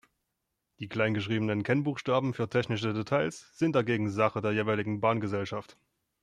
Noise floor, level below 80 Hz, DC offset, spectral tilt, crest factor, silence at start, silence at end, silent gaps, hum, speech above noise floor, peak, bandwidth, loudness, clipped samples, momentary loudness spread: -83 dBFS; -68 dBFS; under 0.1%; -6.5 dB/octave; 18 dB; 0.8 s; 0.6 s; none; none; 53 dB; -12 dBFS; 10.5 kHz; -30 LUFS; under 0.1%; 6 LU